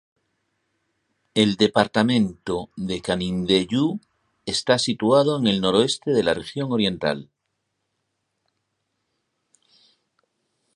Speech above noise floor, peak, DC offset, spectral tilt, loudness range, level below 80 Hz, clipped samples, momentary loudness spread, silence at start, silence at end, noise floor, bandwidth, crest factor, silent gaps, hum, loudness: 56 dB; -2 dBFS; under 0.1%; -5 dB/octave; 9 LU; -54 dBFS; under 0.1%; 10 LU; 1.35 s; 3.55 s; -77 dBFS; 11.5 kHz; 22 dB; none; none; -21 LUFS